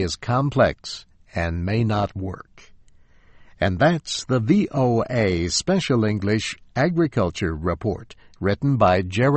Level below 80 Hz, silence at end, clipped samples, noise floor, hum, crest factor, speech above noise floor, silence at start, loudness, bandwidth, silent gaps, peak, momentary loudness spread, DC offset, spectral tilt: -42 dBFS; 0 s; under 0.1%; -51 dBFS; none; 18 dB; 30 dB; 0 s; -22 LUFS; 8.8 kHz; none; -4 dBFS; 10 LU; under 0.1%; -6 dB/octave